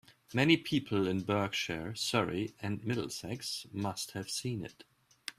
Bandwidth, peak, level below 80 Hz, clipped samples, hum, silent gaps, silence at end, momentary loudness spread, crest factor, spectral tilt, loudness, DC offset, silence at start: 15.5 kHz; -12 dBFS; -66 dBFS; under 0.1%; none; none; 0.1 s; 11 LU; 22 dB; -4.5 dB/octave; -34 LUFS; under 0.1%; 0.1 s